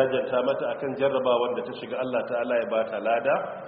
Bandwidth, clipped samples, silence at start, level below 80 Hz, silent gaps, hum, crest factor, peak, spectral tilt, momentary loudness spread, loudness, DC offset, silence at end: 4.6 kHz; under 0.1%; 0 s; -68 dBFS; none; none; 16 dB; -10 dBFS; -3 dB/octave; 6 LU; -26 LUFS; under 0.1%; 0 s